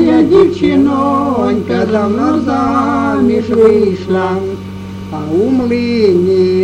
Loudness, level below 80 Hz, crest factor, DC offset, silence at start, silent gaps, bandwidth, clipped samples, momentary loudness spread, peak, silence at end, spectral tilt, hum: -12 LUFS; -42 dBFS; 10 dB; under 0.1%; 0 s; none; 9.8 kHz; under 0.1%; 9 LU; 0 dBFS; 0 s; -7.5 dB/octave; none